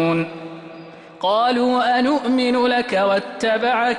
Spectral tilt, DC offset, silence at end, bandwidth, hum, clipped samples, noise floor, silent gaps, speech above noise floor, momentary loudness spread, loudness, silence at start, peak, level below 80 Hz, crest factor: -5.5 dB/octave; under 0.1%; 0 s; 11 kHz; none; under 0.1%; -39 dBFS; none; 21 dB; 18 LU; -19 LUFS; 0 s; -8 dBFS; -60 dBFS; 12 dB